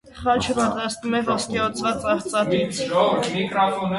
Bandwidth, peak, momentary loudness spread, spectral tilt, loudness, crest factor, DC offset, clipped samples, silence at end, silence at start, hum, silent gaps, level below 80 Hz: 11.5 kHz; -6 dBFS; 4 LU; -4.5 dB/octave; -22 LUFS; 16 dB; under 0.1%; under 0.1%; 0 s; 0.05 s; none; none; -50 dBFS